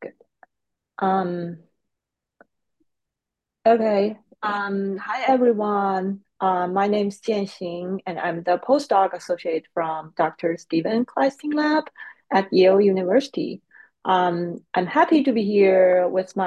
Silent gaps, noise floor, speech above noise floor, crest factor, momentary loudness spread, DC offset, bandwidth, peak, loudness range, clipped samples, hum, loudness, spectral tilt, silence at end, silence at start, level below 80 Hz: none; -85 dBFS; 65 dB; 16 dB; 12 LU; under 0.1%; 9.8 kHz; -6 dBFS; 5 LU; under 0.1%; none; -22 LUFS; -6.5 dB/octave; 0 s; 0 s; -72 dBFS